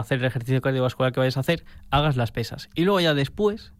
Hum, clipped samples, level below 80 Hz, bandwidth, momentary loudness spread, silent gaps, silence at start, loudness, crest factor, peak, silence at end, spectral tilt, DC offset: none; under 0.1%; -44 dBFS; 16 kHz; 7 LU; none; 0 s; -24 LUFS; 16 dB; -8 dBFS; 0.15 s; -6.5 dB/octave; 0.1%